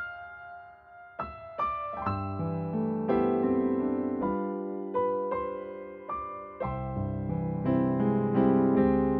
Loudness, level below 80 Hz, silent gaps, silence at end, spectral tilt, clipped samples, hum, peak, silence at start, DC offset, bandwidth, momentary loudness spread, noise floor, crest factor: -30 LUFS; -50 dBFS; none; 0 s; -9 dB/octave; under 0.1%; none; -10 dBFS; 0 s; under 0.1%; 4.3 kHz; 15 LU; -51 dBFS; 18 dB